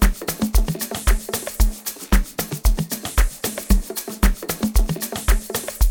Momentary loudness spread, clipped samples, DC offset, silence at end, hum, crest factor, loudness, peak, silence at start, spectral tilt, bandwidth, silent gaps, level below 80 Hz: 4 LU; under 0.1%; under 0.1%; 0 s; none; 18 dB; -23 LUFS; -2 dBFS; 0 s; -4.5 dB/octave; 17.5 kHz; none; -20 dBFS